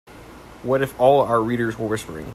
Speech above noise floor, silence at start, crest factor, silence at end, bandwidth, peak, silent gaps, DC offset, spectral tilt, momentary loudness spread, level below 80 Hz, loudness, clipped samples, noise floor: 22 dB; 0.1 s; 18 dB; 0 s; 15 kHz; -2 dBFS; none; under 0.1%; -6.5 dB/octave; 10 LU; -50 dBFS; -20 LUFS; under 0.1%; -42 dBFS